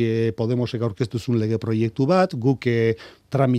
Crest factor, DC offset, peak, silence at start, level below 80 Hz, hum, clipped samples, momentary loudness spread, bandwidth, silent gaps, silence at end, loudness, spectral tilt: 16 dB; under 0.1%; -4 dBFS; 0 s; -58 dBFS; none; under 0.1%; 6 LU; 10 kHz; none; 0 s; -22 LUFS; -8 dB/octave